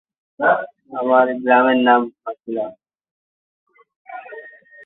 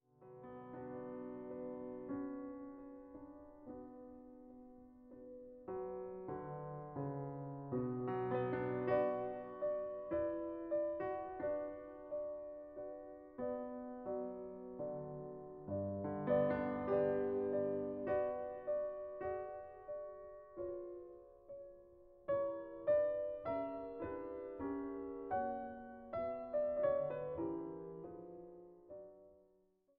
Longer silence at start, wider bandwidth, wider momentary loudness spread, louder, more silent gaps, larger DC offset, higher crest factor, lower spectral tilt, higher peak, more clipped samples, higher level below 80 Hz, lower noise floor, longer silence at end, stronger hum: first, 0.4 s vs 0.2 s; about the same, 4 kHz vs 4.1 kHz; first, 22 LU vs 19 LU; first, -17 LUFS vs -42 LUFS; first, 3.11-3.66 s, 3.96-4.05 s vs none; neither; about the same, 18 dB vs 18 dB; about the same, -9 dB/octave vs -8 dB/octave; first, -2 dBFS vs -24 dBFS; neither; about the same, -72 dBFS vs -70 dBFS; second, -40 dBFS vs -75 dBFS; second, 0.35 s vs 0.55 s; neither